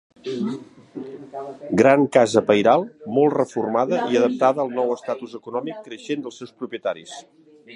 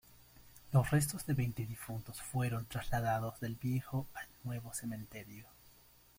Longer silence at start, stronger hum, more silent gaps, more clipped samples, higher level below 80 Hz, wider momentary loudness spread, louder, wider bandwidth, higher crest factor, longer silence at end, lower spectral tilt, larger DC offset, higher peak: first, 0.25 s vs 0.1 s; neither; neither; neither; second, -64 dBFS vs -58 dBFS; first, 19 LU vs 13 LU; first, -21 LUFS vs -38 LUFS; second, 11 kHz vs 16.5 kHz; about the same, 20 dB vs 20 dB; second, 0 s vs 0.5 s; about the same, -5.5 dB/octave vs -6 dB/octave; neither; first, 0 dBFS vs -18 dBFS